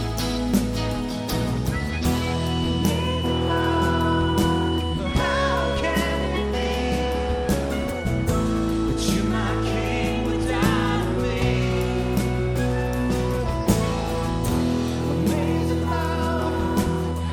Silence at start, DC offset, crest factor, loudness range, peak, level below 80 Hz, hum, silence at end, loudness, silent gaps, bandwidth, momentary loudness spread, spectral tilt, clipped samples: 0 s; under 0.1%; 16 dB; 2 LU; -6 dBFS; -30 dBFS; none; 0 s; -23 LUFS; none; 19 kHz; 4 LU; -6 dB/octave; under 0.1%